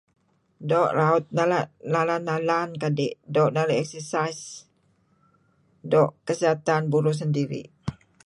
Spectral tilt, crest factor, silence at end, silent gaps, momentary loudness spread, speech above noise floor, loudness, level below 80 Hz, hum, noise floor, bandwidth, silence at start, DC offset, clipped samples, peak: -6 dB/octave; 18 dB; 0.35 s; none; 15 LU; 42 dB; -24 LUFS; -62 dBFS; none; -65 dBFS; 11.5 kHz; 0.6 s; under 0.1%; under 0.1%; -8 dBFS